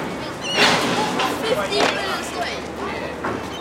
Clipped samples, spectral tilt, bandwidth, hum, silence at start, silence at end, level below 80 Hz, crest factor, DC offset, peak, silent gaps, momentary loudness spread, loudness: under 0.1%; -3 dB/octave; 17 kHz; none; 0 s; 0 s; -48 dBFS; 20 dB; under 0.1%; -2 dBFS; none; 11 LU; -21 LUFS